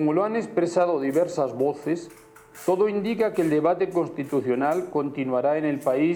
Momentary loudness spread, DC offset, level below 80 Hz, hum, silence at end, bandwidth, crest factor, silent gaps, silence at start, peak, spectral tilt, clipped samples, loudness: 5 LU; under 0.1%; -66 dBFS; none; 0 s; 19 kHz; 14 dB; none; 0 s; -10 dBFS; -7 dB/octave; under 0.1%; -24 LUFS